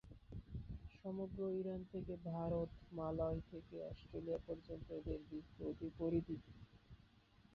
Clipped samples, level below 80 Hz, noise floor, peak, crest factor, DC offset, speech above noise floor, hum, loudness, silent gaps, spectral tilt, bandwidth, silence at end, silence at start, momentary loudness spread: under 0.1%; -60 dBFS; -70 dBFS; -28 dBFS; 18 dB; under 0.1%; 24 dB; none; -47 LUFS; none; -9 dB/octave; 6.6 kHz; 0 s; 0.05 s; 15 LU